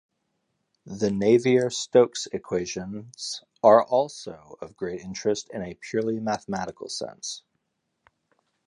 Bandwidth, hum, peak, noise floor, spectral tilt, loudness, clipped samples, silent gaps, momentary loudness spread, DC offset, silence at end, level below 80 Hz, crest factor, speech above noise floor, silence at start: 11 kHz; none; -4 dBFS; -78 dBFS; -4.5 dB/octave; -25 LUFS; under 0.1%; none; 17 LU; under 0.1%; 1.3 s; -62 dBFS; 22 dB; 53 dB; 0.85 s